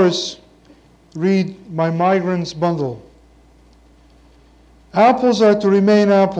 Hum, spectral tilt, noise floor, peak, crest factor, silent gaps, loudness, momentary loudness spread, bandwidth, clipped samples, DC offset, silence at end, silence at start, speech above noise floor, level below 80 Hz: none; -6.5 dB/octave; -49 dBFS; -2 dBFS; 16 dB; none; -16 LUFS; 12 LU; 8.6 kHz; under 0.1%; under 0.1%; 0 s; 0 s; 34 dB; -52 dBFS